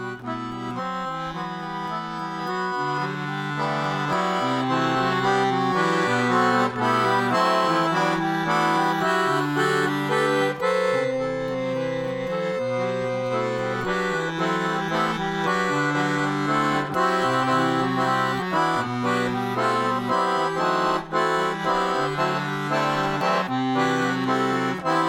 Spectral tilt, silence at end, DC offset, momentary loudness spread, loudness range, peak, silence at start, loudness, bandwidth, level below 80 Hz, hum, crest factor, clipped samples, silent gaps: -5.5 dB/octave; 0 s; under 0.1%; 7 LU; 5 LU; -8 dBFS; 0 s; -23 LUFS; 19 kHz; -56 dBFS; none; 16 dB; under 0.1%; none